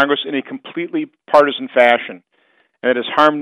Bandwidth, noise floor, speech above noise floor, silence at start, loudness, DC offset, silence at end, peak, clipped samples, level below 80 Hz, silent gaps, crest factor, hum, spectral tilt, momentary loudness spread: 10 kHz; -59 dBFS; 43 dB; 0 s; -16 LUFS; under 0.1%; 0 s; 0 dBFS; under 0.1%; -66 dBFS; none; 16 dB; none; -5 dB/octave; 12 LU